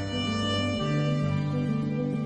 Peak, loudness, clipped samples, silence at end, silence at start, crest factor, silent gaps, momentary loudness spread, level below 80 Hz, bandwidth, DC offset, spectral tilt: -16 dBFS; -28 LUFS; under 0.1%; 0 s; 0 s; 12 dB; none; 2 LU; -52 dBFS; 9.4 kHz; under 0.1%; -6.5 dB/octave